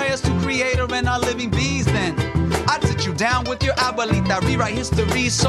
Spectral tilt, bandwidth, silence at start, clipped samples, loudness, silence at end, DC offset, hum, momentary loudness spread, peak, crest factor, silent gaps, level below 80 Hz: -4.5 dB/octave; 13 kHz; 0 s; under 0.1%; -20 LUFS; 0 s; under 0.1%; none; 2 LU; -2 dBFS; 18 dB; none; -32 dBFS